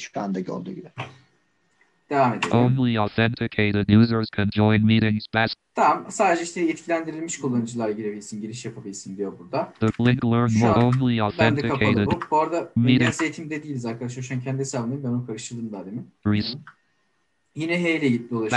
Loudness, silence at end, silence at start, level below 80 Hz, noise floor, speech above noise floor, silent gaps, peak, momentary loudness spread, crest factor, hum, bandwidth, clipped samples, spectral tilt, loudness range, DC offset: -23 LUFS; 0 s; 0 s; -54 dBFS; -71 dBFS; 49 dB; none; -4 dBFS; 15 LU; 18 dB; none; 10.5 kHz; under 0.1%; -6 dB/octave; 8 LU; under 0.1%